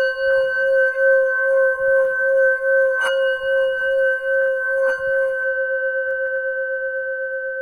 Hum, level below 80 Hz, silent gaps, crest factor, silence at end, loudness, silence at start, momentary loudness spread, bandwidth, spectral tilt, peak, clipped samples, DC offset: none; -58 dBFS; none; 12 dB; 0 s; -19 LUFS; 0 s; 7 LU; 10.5 kHz; -1.5 dB/octave; -8 dBFS; under 0.1%; under 0.1%